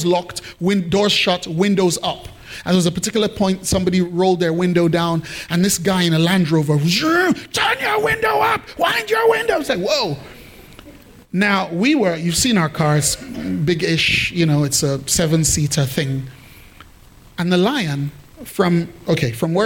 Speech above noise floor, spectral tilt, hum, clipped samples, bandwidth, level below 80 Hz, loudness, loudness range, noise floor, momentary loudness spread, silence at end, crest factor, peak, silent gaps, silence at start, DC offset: 27 dB; -4.5 dB/octave; none; under 0.1%; 17 kHz; -44 dBFS; -17 LUFS; 3 LU; -45 dBFS; 9 LU; 0 s; 14 dB; -4 dBFS; none; 0 s; under 0.1%